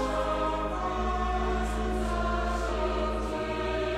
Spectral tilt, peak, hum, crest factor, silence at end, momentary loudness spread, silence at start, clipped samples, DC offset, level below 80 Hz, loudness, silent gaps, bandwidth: -6 dB/octave; -16 dBFS; none; 12 dB; 0 s; 2 LU; 0 s; under 0.1%; under 0.1%; -34 dBFS; -30 LUFS; none; 12 kHz